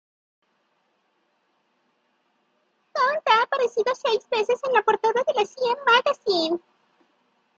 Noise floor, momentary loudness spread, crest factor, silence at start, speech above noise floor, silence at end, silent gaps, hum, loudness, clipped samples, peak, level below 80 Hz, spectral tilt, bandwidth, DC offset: -70 dBFS; 6 LU; 20 dB; 2.95 s; 47 dB; 1 s; none; none; -22 LUFS; under 0.1%; -6 dBFS; -76 dBFS; -2.5 dB/octave; 7.6 kHz; under 0.1%